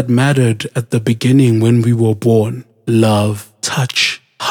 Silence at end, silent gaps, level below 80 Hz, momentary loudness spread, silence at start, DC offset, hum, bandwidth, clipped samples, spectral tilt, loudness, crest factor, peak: 0 s; none; -58 dBFS; 9 LU; 0 s; under 0.1%; none; 16.5 kHz; under 0.1%; -6 dB/octave; -14 LUFS; 12 dB; 0 dBFS